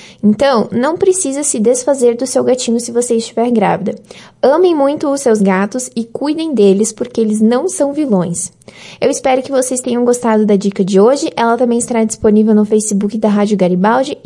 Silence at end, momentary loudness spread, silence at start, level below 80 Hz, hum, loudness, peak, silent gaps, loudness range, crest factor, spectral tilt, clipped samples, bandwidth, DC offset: 0.1 s; 6 LU; 0 s; -54 dBFS; none; -13 LUFS; 0 dBFS; none; 2 LU; 12 dB; -5 dB/octave; under 0.1%; 11.5 kHz; under 0.1%